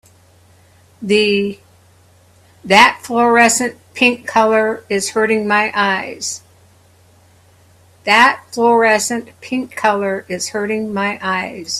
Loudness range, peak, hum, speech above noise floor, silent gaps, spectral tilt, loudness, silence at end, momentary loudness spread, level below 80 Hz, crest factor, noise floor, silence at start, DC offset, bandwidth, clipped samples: 4 LU; 0 dBFS; none; 34 dB; none; -3 dB/octave; -15 LUFS; 0 s; 13 LU; -60 dBFS; 16 dB; -49 dBFS; 1 s; under 0.1%; 15 kHz; under 0.1%